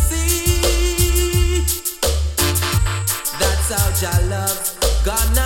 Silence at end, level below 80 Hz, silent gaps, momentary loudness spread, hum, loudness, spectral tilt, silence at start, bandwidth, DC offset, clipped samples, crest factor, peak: 0 s; -20 dBFS; none; 3 LU; none; -18 LUFS; -3.5 dB/octave; 0 s; 17.5 kHz; under 0.1%; under 0.1%; 14 dB; -4 dBFS